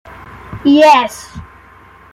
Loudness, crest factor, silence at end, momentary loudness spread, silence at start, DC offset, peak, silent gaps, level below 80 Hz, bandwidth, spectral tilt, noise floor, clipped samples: -10 LUFS; 14 dB; 0.7 s; 24 LU; 0.5 s; under 0.1%; 0 dBFS; none; -44 dBFS; 14.5 kHz; -4.5 dB/octave; -41 dBFS; under 0.1%